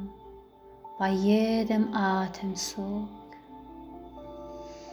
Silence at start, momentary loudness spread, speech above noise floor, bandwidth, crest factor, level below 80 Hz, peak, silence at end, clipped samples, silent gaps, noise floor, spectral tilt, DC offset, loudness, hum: 0 s; 23 LU; 24 dB; 20 kHz; 18 dB; -58 dBFS; -12 dBFS; 0 s; under 0.1%; none; -51 dBFS; -5.5 dB/octave; under 0.1%; -28 LUFS; none